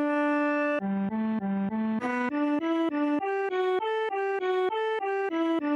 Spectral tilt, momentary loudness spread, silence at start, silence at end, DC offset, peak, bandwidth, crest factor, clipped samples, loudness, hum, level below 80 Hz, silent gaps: -7.5 dB/octave; 3 LU; 0 s; 0 s; under 0.1%; -16 dBFS; 9.4 kHz; 12 dB; under 0.1%; -28 LUFS; none; -74 dBFS; none